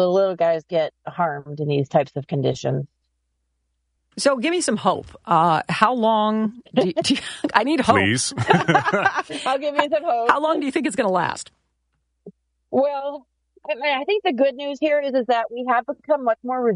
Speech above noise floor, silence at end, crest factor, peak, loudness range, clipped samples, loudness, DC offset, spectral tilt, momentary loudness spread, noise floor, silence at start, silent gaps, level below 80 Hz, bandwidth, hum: 52 dB; 0 s; 20 dB; 0 dBFS; 6 LU; under 0.1%; -21 LUFS; under 0.1%; -4.5 dB/octave; 8 LU; -73 dBFS; 0 s; none; -60 dBFS; 11 kHz; none